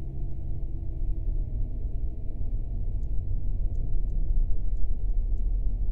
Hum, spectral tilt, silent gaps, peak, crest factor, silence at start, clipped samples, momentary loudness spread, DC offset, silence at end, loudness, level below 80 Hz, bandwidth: none; -11.5 dB/octave; none; -12 dBFS; 14 dB; 0 s; under 0.1%; 5 LU; under 0.1%; 0 s; -34 LUFS; -28 dBFS; 0.9 kHz